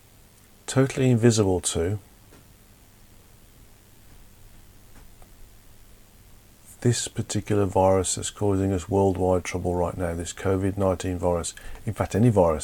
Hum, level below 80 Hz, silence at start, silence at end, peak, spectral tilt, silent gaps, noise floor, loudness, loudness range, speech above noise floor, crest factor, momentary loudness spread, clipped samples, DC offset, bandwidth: none; -46 dBFS; 0.7 s; 0 s; -6 dBFS; -5.5 dB/octave; none; -53 dBFS; -24 LUFS; 9 LU; 30 dB; 20 dB; 10 LU; under 0.1%; under 0.1%; 18.5 kHz